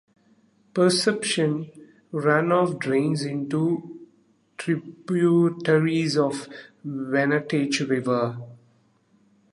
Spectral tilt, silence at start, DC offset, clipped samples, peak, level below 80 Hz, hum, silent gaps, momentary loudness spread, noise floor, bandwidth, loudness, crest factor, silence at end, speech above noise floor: -5.5 dB/octave; 0.75 s; under 0.1%; under 0.1%; -6 dBFS; -72 dBFS; none; none; 14 LU; -62 dBFS; 11.5 kHz; -23 LUFS; 18 dB; 0.95 s; 39 dB